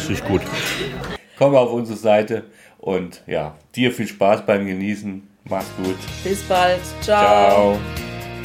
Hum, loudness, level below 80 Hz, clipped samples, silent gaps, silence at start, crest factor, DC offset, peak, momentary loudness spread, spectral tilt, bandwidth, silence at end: none; -19 LUFS; -42 dBFS; under 0.1%; none; 0 s; 18 dB; under 0.1%; -2 dBFS; 14 LU; -5 dB/octave; 16.5 kHz; 0 s